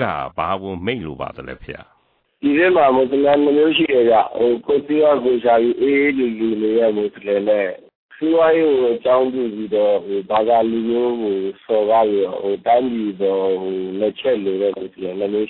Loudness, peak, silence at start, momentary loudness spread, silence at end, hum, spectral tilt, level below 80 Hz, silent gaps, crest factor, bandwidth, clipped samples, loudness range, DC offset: -17 LUFS; -4 dBFS; 0 s; 10 LU; 0 s; none; -9.5 dB/octave; -54 dBFS; 7.95-8.09 s; 12 dB; 4.3 kHz; under 0.1%; 4 LU; under 0.1%